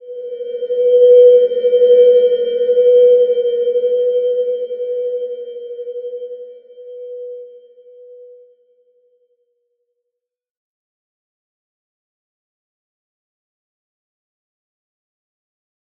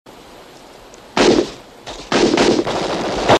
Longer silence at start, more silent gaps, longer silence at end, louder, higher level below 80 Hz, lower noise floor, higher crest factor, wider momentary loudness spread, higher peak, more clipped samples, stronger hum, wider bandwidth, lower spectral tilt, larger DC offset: about the same, 0.05 s vs 0.05 s; neither; first, 7.85 s vs 0 s; first, -12 LUFS vs -16 LUFS; second, -84 dBFS vs -42 dBFS; first, -80 dBFS vs -40 dBFS; about the same, 16 dB vs 18 dB; first, 21 LU vs 18 LU; about the same, -2 dBFS vs 0 dBFS; neither; neither; second, 3.4 kHz vs 13 kHz; first, -6 dB/octave vs -4 dB/octave; neither